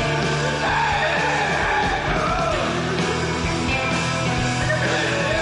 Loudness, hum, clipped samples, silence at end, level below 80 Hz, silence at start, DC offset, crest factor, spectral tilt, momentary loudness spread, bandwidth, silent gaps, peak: -21 LUFS; none; under 0.1%; 0 s; -36 dBFS; 0 s; under 0.1%; 10 dB; -4.5 dB/octave; 3 LU; 11 kHz; none; -10 dBFS